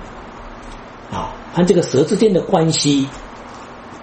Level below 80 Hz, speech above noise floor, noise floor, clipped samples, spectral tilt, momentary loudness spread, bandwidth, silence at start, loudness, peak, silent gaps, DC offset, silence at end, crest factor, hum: -42 dBFS; 19 dB; -35 dBFS; under 0.1%; -5.5 dB/octave; 21 LU; 8.8 kHz; 0 s; -16 LUFS; 0 dBFS; none; under 0.1%; 0 s; 18 dB; none